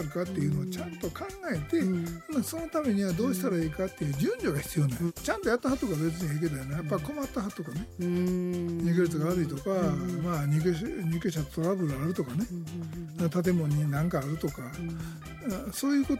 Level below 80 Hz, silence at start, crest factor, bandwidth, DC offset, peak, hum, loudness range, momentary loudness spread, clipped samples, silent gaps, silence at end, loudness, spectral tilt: -50 dBFS; 0 s; 16 dB; 16.5 kHz; under 0.1%; -14 dBFS; none; 2 LU; 9 LU; under 0.1%; none; 0 s; -31 LUFS; -6.5 dB/octave